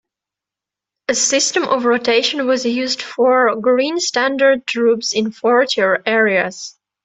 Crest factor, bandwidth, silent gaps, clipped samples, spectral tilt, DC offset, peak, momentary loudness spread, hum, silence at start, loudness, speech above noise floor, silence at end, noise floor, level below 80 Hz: 14 dB; 8.4 kHz; none; under 0.1%; -2 dB/octave; under 0.1%; -2 dBFS; 6 LU; none; 1.1 s; -16 LUFS; 70 dB; 0.35 s; -86 dBFS; -64 dBFS